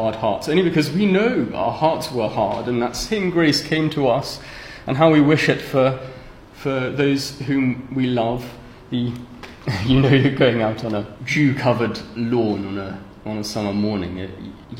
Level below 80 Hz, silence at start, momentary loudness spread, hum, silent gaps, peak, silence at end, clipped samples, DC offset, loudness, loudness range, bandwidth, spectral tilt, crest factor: -44 dBFS; 0 s; 14 LU; none; none; -2 dBFS; 0 s; under 0.1%; under 0.1%; -20 LUFS; 4 LU; 16.5 kHz; -6 dB/octave; 18 dB